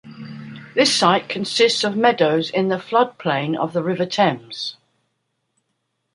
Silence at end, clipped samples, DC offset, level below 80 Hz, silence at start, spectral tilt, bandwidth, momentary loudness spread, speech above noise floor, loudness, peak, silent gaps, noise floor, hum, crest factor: 1.4 s; under 0.1%; under 0.1%; -68 dBFS; 0.05 s; -4 dB/octave; 11.5 kHz; 13 LU; 54 dB; -19 LUFS; -2 dBFS; none; -73 dBFS; none; 18 dB